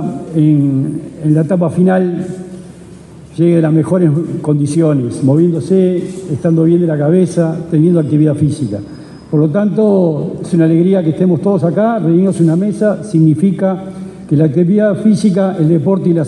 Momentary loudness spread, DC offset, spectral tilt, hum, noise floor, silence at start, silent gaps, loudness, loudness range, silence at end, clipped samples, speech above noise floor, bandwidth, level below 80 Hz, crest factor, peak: 9 LU; under 0.1%; -9 dB/octave; none; -34 dBFS; 0 s; none; -12 LUFS; 2 LU; 0 s; under 0.1%; 23 dB; 11 kHz; -50 dBFS; 10 dB; 0 dBFS